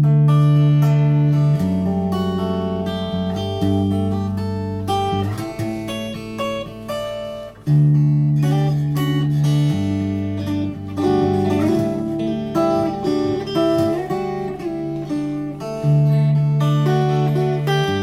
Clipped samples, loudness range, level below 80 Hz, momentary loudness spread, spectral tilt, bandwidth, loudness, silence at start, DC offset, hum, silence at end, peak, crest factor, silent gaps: under 0.1%; 4 LU; -46 dBFS; 10 LU; -8 dB/octave; 12.5 kHz; -19 LUFS; 0 s; under 0.1%; 50 Hz at -45 dBFS; 0 s; -6 dBFS; 12 dB; none